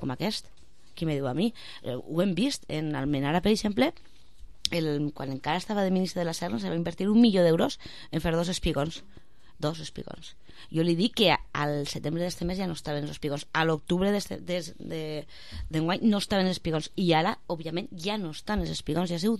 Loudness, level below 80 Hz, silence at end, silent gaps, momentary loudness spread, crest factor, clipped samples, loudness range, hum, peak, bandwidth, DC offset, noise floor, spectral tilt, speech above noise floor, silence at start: -28 LUFS; -48 dBFS; 0 s; none; 11 LU; 24 dB; under 0.1%; 4 LU; none; -4 dBFS; 14 kHz; 0.6%; -49 dBFS; -5.5 dB/octave; 21 dB; 0 s